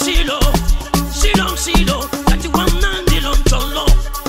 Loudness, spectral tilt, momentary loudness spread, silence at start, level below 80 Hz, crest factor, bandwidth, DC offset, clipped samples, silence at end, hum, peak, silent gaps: -16 LUFS; -4 dB/octave; 3 LU; 0 s; -16 dBFS; 12 dB; 16.5 kHz; under 0.1%; under 0.1%; 0 s; none; -2 dBFS; none